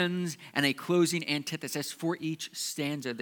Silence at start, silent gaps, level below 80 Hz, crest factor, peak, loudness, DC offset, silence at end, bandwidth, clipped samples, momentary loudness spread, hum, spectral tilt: 0 s; none; -86 dBFS; 22 dB; -10 dBFS; -31 LUFS; under 0.1%; 0 s; 19 kHz; under 0.1%; 8 LU; none; -4 dB/octave